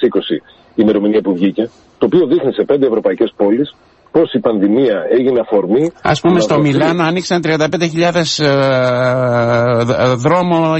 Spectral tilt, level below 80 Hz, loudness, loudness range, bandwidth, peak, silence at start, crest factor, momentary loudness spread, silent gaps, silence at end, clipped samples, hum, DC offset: -6 dB/octave; -50 dBFS; -13 LUFS; 1 LU; 8.4 kHz; -2 dBFS; 0 s; 12 dB; 4 LU; none; 0 s; under 0.1%; none; under 0.1%